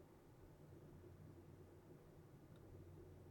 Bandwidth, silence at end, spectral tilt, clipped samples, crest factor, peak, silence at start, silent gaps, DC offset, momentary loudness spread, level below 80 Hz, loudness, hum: 17 kHz; 0 s; -7.5 dB/octave; under 0.1%; 12 dB; -50 dBFS; 0 s; none; under 0.1%; 3 LU; -74 dBFS; -63 LUFS; none